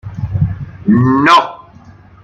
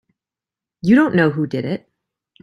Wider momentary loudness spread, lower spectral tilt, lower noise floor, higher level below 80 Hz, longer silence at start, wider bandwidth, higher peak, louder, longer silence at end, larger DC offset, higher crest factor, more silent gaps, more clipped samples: about the same, 13 LU vs 13 LU; second, -6.5 dB/octave vs -8.5 dB/octave; second, -39 dBFS vs -88 dBFS; first, -36 dBFS vs -56 dBFS; second, 0.05 s vs 0.85 s; about the same, 9.8 kHz vs 10.5 kHz; about the same, 0 dBFS vs -2 dBFS; first, -12 LUFS vs -17 LUFS; about the same, 0.65 s vs 0.65 s; neither; about the same, 14 dB vs 16 dB; neither; neither